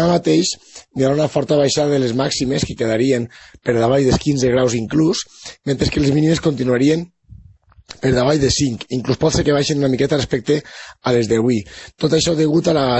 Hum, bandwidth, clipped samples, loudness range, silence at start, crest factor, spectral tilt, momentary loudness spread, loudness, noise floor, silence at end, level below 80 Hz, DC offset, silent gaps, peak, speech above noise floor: none; 8.4 kHz; under 0.1%; 1 LU; 0 s; 14 dB; -5.5 dB/octave; 8 LU; -17 LUFS; -47 dBFS; 0 s; -40 dBFS; under 0.1%; none; -4 dBFS; 30 dB